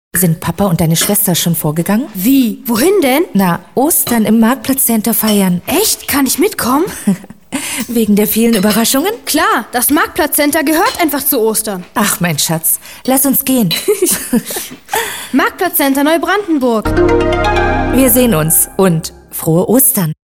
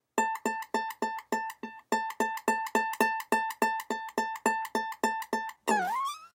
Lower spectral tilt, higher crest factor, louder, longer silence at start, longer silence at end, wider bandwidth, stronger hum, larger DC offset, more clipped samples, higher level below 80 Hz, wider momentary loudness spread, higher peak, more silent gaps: first, -4 dB/octave vs -2.5 dB/octave; second, 12 dB vs 20 dB; first, -12 LUFS vs -31 LUFS; about the same, 0.15 s vs 0.15 s; about the same, 0.15 s vs 0.15 s; first, over 20 kHz vs 17 kHz; neither; first, 0.4% vs under 0.1%; neither; first, -32 dBFS vs -76 dBFS; about the same, 6 LU vs 6 LU; first, 0 dBFS vs -12 dBFS; neither